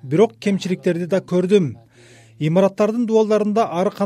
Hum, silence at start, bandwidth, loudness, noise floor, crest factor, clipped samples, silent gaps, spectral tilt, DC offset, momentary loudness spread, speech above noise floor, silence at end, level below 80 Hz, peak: none; 0.05 s; 12 kHz; -19 LUFS; -47 dBFS; 16 dB; under 0.1%; none; -7 dB/octave; under 0.1%; 5 LU; 30 dB; 0 s; -66 dBFS; -4 dBFS